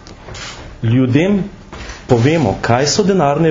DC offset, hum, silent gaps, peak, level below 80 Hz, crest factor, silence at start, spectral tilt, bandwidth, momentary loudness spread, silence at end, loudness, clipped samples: under 0.1%; none; none; 0 dBFS; -38 dBFS; 14 dB; 0.05 s; -6 dB/octave; 7.6 kHz; 17 LU; 0 s; -14 LUFS; under 0.1%